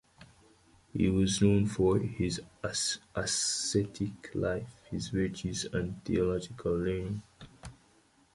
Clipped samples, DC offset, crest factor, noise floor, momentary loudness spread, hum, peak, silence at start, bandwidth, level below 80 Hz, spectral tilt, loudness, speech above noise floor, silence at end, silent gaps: under 0.1%; under 0.1%; 20 dB; -65 dBFS; 13 LU; none; -12 dBFS; 0.2 s; 11.5 kHz; -50 dBFS; -4.5 dB/octave; -32 LUFS; 34 dB; 0.6 s; none